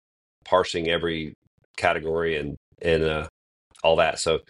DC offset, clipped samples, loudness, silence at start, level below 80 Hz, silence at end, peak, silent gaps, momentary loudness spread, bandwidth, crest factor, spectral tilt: under 0.1%; under 0.1%; -24 LUFS; 0.45 s; -46 dBFS; 0.1 s; -6 dBFS; 1.35-1.58 s, 1.65-1.74 s, 2.57-2.72 s, 3.29-3.71 s; 13 LU; 11.5 kHz; 20 dB; -4 dB/octave